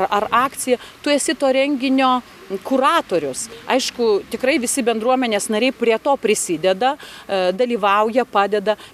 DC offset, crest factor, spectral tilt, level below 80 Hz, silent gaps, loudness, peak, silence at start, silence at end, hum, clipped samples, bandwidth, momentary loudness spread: under 0.1%; 16 dB; -3 dB/octave; -58 dBFS; none; -18 LUFS; -2 dBFS; 0 s; 0.05 s; none; under 0.1%; 15.5 kHz; 5 LU